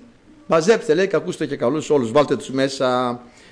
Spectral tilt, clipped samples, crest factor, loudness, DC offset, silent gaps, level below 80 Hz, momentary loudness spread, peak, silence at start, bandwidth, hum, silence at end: -5 dB/octave; under 0.1%; 14 dB; -19 LUFS; under 0.1%; none; -58 dBFS; 6 LU; -6 dBFS; 0.5 s; 10.5 kHz; none; 0.25 s